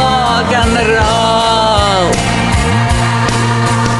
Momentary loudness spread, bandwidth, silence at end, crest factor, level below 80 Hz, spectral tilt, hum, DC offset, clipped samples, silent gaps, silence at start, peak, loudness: 2 LU; 12 kHz; 0 s; 10 dB; -24 dBFS; -4.5 dB/octave; none; under 0.1%; under 0.1%; none; 0 s; 0 dBFS; -11 LUFS